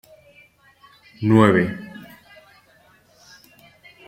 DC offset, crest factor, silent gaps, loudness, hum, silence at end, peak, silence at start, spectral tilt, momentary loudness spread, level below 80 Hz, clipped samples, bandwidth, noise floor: under 0.1%; 22 dB; none; -18 LUFS; none; 2.2 s; -2 dBFS; 1.2 s; -8 dB/octave; 25 LU; -58 dBFS; under 0.1%; 15.5 kHz; -55 dBFS